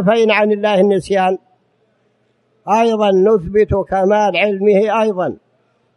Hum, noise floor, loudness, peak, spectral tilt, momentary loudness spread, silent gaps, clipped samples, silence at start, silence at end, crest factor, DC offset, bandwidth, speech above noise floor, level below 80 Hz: none; -60 dBFS; -14 LUFS; -2 dBFS; -6.5 dB/octave; 6 LU; none; under 0.1%; 0 s; 0.6 s; 14 dB; under 0.1%; 11 kHz; 47 dB; -42 dBFS